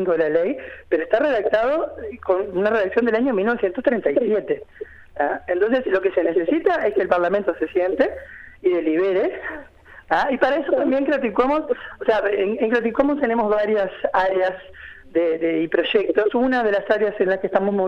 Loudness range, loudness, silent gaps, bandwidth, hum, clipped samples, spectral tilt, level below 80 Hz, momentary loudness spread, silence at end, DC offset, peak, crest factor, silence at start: 1 LU; -20 LUFS; none; 6.8 kHz; none; under 0.1%; -7 dB/octave; -52 dBFS; 7 LU; 0 s; under 0.1%; -4 dBFS; 16 dB; 0 s